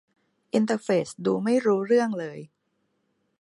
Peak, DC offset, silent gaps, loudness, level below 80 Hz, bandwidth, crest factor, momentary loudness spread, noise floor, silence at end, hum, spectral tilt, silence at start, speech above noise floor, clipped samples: -10 dBFS; under 0.1%; none; -25 LUFS; -76 dBFS; 11.5 kHz; 16 dB; 11 LU; -74 dBFS; 0.95 s; none; -6 dB/octave; 0.55 s; 50 dB; under 0.1%